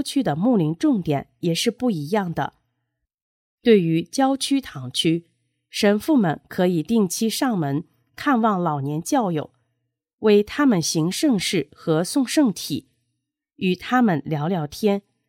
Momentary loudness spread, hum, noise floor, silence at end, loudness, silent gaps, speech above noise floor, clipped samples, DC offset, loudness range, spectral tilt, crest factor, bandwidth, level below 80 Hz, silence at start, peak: 9 LU; none; -78 dBFS; 0.3 s; -22 LUFS; 3.14-3.58 s, 10.13-10.18 s; 58 dB; under 0.1%; under 0.1%; 2 LU; -5 dB/octave; 18 dB; 17 kHz; -60 dBFS; 0 s; -4 dBFS